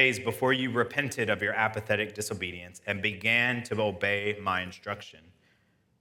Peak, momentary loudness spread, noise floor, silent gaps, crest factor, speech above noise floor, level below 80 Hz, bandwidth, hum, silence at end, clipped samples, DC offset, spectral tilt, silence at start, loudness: -6 dBFS; 12 LU; -68 dBFS; none; 24 dB; 39 dB; -70 dBFS; 17.5 kHz; none; 0.85 s; under 0.1%; under 0.1%; -4 dB/octave; 0 s; -28 LUFS